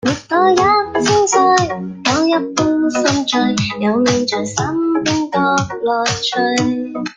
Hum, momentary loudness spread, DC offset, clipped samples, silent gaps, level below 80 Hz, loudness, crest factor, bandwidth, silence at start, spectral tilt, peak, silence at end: none; 6 LU; under 0.1%; under 0.1%; none; -48 dBFS; -15 LUFS; 14 dB; 9.8 kHz; 0.05 s; -4 dB/octave; 0 dBFS; 0.05 s